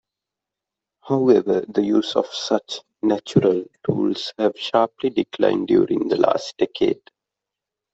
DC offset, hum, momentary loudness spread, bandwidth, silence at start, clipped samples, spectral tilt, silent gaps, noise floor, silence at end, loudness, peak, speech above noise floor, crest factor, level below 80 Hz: under 0.1%; none; 7 LU; 8 kHz; 1.05 s; under 0.1%; -6 dB/octave; none; -86 dBFS; 1 s; -21 LUFS; -2 dBFS; 66 dB; 18 dB; -62 dBFS